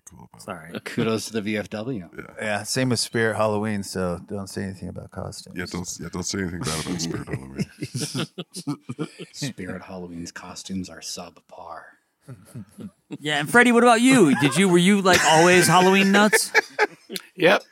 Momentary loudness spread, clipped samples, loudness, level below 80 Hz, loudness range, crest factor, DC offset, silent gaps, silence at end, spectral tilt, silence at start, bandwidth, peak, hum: 21 LU; under 0.1%; -21 LUFS; -56 dBFS; 18 LU; 20 dB; under 0.1%; none; 0.1 s; -4 dB/octave; 0.2 s; 16.5 kHz; -2 dBFS; none